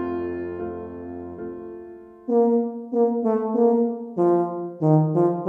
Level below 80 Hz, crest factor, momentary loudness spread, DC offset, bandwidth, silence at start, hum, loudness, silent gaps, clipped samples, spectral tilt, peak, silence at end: -60 dBFS; 16 dB; 16 LU; under 0.1%; 3.3 kHz; 0 s; none; -22 LUFS; none; under 0.1%; -12 dB/octave; -6 dBFS; 0 s